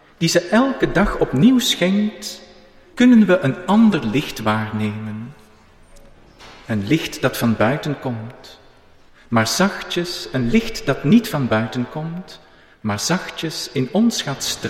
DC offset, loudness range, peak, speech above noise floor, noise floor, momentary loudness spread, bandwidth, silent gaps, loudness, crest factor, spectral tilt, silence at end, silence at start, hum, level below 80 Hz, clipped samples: under 0.1%; 6 LU; -4 dBFS; 30 dB; -48 dBFS; 15 LU; 16 kHz; none; -18 LUFS; 16 dB; -5 dB/octave; 0 s; 0.2 s; none; -40 dBFS; under 0.1%